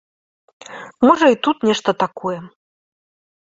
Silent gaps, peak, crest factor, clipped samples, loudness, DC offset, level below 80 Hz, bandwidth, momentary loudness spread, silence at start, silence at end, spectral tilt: none; -2 dBFS; 18 dB; under 0.1%; -17 LUFS; under 0.1%; -62 dBFS; 7.8 kHz; 22 LU; 0.7 s; 0.95 s; -5 dB/octave